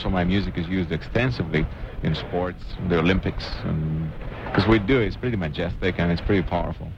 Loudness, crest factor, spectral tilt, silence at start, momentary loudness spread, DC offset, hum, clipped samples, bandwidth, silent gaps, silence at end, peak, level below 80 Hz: -24 LUFS; 18 dB; -8 dB/octave; 0 s; 9 LU; under 0.1%; none; under 0.1%; 7.4 kHz; none; 0 s; -6 dBFS; -34 dBFS